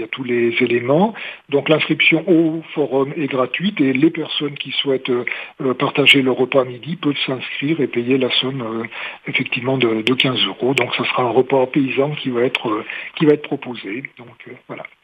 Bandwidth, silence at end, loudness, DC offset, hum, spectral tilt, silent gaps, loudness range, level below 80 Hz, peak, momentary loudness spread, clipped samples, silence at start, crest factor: 10 kHz; 0.2 s; -18 LUFS; under 0.1%; none; -6 dB/octave; none; 3 LU; -68 dBFS; 0 dBFS; 12 LU; under 0.1%; 0 s; 18 dB